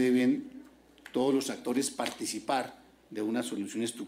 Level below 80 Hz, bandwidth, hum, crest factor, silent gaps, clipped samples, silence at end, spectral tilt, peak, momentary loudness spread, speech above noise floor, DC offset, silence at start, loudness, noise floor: -72 dBFS; 16 kHz; none; 18 dB; none; under 0.1%; 0 s; -4 dB/octave; -14 dBFS; 13 LU; 23 dB; under 0.1%; 0 s; -32 LUFS; -55 dBFS